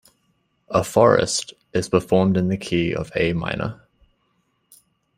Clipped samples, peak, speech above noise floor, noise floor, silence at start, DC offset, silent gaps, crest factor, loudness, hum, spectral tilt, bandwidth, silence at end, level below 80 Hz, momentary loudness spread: under 0.1%; -2 dBFS; 48 dB; -68 dBFS; 0.7 s; under 0.1%; none; 20 dB; -21 LUFS; none; -5.5 dB/octave; 15.5 kHz; 1.45 s; -50 dBFS; 11 LU